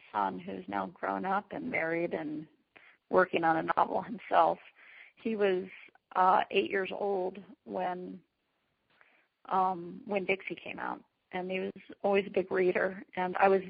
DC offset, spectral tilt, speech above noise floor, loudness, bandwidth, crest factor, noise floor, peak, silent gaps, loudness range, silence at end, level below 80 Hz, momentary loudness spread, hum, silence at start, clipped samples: under 0.1%; -3.5 dB/octave; 48 dB; -32 LUFS; 4.9 kHz; 22 dB; -79 dBFS; -10 dBFS; none; 6 LU; 0 s; -74 dBFS; 14 LU; none; 0.15 s; under 0.1%